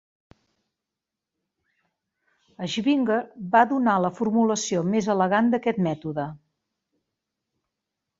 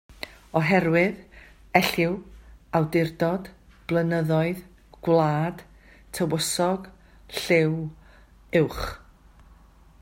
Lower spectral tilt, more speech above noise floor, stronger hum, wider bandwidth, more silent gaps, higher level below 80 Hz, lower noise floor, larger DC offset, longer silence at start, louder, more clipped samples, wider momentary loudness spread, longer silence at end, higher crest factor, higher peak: about the same, -5.5 dB/octave vs -5.5 dB/octave; first, 64 dB vs 29 dB; neither; second, 7.8 kHz vs 16 kHz; neither; second, -66 dBFS vs -50 dBFS; first, -87 dBFS vs -53 dBFS; neither; first, 2.6 s vs 0.25 s; about the same, -23 LUFS vs -25 LUFS; neither; second, 10 LU vs 16 LU; first, 1.85 s vs 1.05 s; about the same, 22 dB vs 22 dB; about the same, -4 dBFS vs -4 dBFS